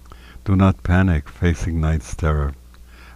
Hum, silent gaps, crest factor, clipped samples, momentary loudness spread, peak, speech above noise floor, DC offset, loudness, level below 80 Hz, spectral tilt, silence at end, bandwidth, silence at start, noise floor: none; none; 16 dB; under 0.1%; 6 LU; -4 dBFS; 24 dB; under 0.1%; -20 LUFS; -30 dBFS; -7.5 dB/octave; 0.05 s; 11 kHz; 0.05 s; -42 dBFS